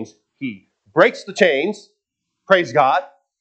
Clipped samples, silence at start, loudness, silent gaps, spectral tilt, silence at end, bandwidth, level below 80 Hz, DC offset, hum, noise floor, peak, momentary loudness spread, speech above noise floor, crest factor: under 0.1%; 0 s; -17 LUFS; none; -4.5 dB/octave; 0.35 s; 8.6 kHz; -74 dBFS; under 0.1%; none; -78 dBFS; 0 dBFS; 15 LU; 61 dB; 20 dB